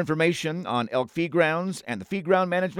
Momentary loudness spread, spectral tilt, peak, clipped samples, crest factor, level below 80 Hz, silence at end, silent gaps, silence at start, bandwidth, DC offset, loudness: 8 LU; -5.5 dB/octave; -6 dBFS; under 0.1%; 20 dB; -68 dBFS; 0 s; none; 0 s; 15.5 kHz; under 0.1%; -25 LUFS